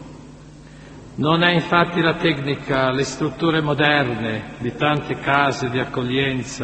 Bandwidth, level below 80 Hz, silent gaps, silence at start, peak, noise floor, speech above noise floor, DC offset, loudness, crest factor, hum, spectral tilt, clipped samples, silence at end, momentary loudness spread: 8.4 kHz; -48 dBFS; none; 0 s; 0 dBFS; -41 dBFS; 21 dB; under 0.1%; -20 LUFS; 20 dB; none; -5.5 dB/octave; under 0.1%; 0 s; 8 LU